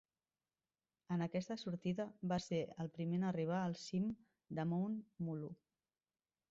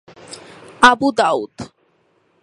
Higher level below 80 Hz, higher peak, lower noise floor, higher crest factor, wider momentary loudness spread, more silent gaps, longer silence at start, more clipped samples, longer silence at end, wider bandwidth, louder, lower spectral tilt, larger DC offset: second, -76 dBFS vs -52 dBFS; second, -28 dBFS vs 0 dBFS; first, under -90 dBFS vs -61 dBFS; about the same, 14 dB vs 18 dB; second, 8 LU vs 25 LU; neither; first, 1.1 s vs 0.3 s; neither; first, 0.95 s vs 0.75 s; second, 7.6 kHz vs 11.5 kHz; second, -42 LUFS vs -14 LUFS; first, -7 dB/octave vs -3 dB/octave; neither